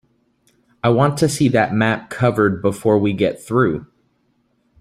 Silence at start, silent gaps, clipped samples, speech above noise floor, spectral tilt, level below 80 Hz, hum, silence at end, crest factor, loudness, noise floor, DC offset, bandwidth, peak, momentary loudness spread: 0.85 s; none; under 0.1%; 47 dB; -6.5 dB/octave; -50 dBFS; none; 0.95 s; 16 dB; -17 LUFS; -64 dBFS; under 0.1%; 15 kHz; -2 dBFS; 4 LU